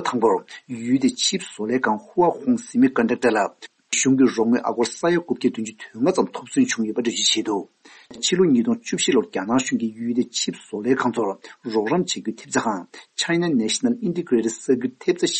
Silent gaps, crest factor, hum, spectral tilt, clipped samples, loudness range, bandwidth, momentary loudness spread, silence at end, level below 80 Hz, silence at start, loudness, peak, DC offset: none; 16 dB; none; -3.5 dB/octave; under 0.1%; 3 LU; 8.8 kHz; 8 LU; 0 s; -66 dBFS; 0 s; -22 LUFS; -6 dBFS; under 0.1%